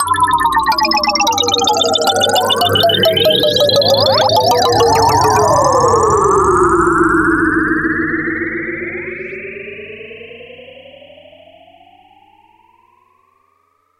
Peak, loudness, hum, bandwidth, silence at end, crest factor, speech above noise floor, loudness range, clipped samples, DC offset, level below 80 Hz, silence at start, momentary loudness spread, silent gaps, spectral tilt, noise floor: -2 dBFS; -12 LUFS; none; 16.5 kHz; 3.35 s; 12 dB; 47 dB; 15 LU; under 0.1%; under 0.1%; -40 dBFS; 0 s; 15 LU; none; -3.5 dB/octave; -59 dBFS